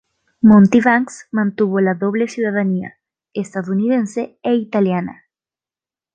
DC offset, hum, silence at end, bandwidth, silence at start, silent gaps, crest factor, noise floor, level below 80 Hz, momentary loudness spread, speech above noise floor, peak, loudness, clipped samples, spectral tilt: under 0.1%; none; 1 s; 9.2 kHz; 0.45 s; none; 16 dB; under -90 dBFS; -56 dBFS; 14 LU; over 74 dB; -2 dBFS; -16 LUFS; under 0.1%; -7.5 dB/octave